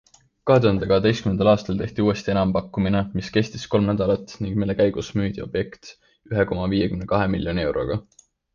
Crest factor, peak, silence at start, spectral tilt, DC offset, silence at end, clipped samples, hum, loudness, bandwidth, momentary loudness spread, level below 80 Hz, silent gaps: 18 dB; -4 dBFS; 0.45 s; -7 dB/octave; under 0.1%; 0.55 s; under 0.1%; none; -22 LUFS; 7.4 kHz; 9 LU; -42 dBFS; none